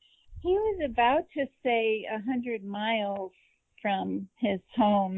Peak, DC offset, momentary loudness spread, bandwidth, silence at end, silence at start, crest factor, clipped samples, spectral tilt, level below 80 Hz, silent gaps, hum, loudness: -12 dBFS; under 0.1%; 10 LU; 4 kHz; 0 s; 0.3 s; 18 dB; under 0.1%; -8.5 dB/octave; -54 dBFS; none; none; -29 LUFS